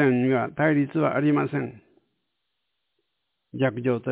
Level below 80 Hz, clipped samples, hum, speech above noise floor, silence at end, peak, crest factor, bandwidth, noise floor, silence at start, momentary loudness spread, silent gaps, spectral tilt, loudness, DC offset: -68 dBFS; under 0.1%; none; 56 dB; 0 s; -10 dBFS; 16 dB; 4 kHz; -79 dBFS; 0 s; 9 LU; none; -11.5 dB/octave; -24 LUFS; under 0.1%